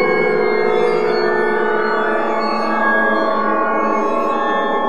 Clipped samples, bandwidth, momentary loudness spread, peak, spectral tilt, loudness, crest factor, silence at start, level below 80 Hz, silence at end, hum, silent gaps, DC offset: under 0.1%; 11 kHz; 3 LU; -4 dBFS; -6 dB/octave; -16 LUFS; 14 dB; 0 s; -60 dBFS; 0 s; none; none; 4%